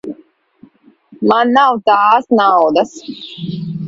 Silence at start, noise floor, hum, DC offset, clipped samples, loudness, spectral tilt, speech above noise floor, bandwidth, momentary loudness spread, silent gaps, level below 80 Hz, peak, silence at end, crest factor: 0.05 s; -48 dBFS; none; under 0.1%; under 0.1%; -12 LUFS; -6 dB/octave; 35 dB; 7.8 kHz; 17 LU; none; -60 dBFS; 0 dBFS; 0 s; 14 dB